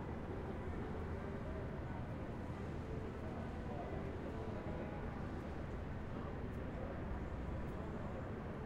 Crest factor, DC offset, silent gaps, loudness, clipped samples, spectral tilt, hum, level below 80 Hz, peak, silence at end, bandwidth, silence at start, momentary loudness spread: 12 dB; under 0.1%; none; -46 LUFS; under 0.1%; -8.5 dB/octave; none; -52 dBFS; -32 dBFS; 0 s; 10.5 kHz; 0 s; 1 LU